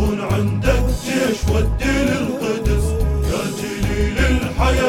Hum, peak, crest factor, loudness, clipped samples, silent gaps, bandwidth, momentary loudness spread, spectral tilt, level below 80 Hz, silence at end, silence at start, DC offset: none; -2 dBFS; 16 dB; -19 LUFS; under 0.1%; none; 16.5 kHz; 3 LU; -6 dB/octave; -22 dBFS; 0 s; 0 s; under 0.1%